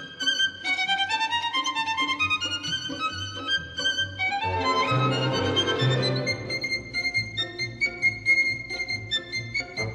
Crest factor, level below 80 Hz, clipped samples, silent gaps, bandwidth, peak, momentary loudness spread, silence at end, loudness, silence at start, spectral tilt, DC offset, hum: 16 dB; -56 dBFS; under 0.1%; none; 12 kHz; -10 dBFS; 6 LU; 0 s; -25 LUFS; 0 s; -3.5 dB/octave; under 0.1%; none